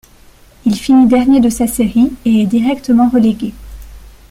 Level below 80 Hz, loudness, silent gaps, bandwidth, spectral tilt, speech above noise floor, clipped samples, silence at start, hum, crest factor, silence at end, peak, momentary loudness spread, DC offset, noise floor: -36 dBFS; -12 LUFS; none; 15.5 kHz; -6 dB/octave; 32 dB; under 0.1%; 0.65 s; none; 10 dB; 0.3 s; -2 dBFS; 8 LU; under 0.1%; -43 dBFS